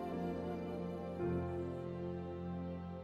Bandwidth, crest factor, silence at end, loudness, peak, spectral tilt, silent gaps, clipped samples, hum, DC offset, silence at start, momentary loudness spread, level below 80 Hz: 7 kHz; 14 dB; 0 s; -42 LUFS; -28 dBFS; -9 dB/octave; none; under 0.1%; none; under 0.1%; 0 s; 5 LU; -66 dBFS